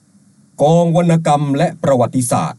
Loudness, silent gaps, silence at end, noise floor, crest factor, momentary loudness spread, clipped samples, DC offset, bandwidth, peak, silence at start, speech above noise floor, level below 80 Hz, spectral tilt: -14 LUFS; none; 0.05 s; -50 dBFS; 12 dB; 4 LU; under 0.1%; under 0.1%; 12 kHz; -2 dBFS; 0.6 s; 37 dB; -54 dBFS; -6.5 dB/octave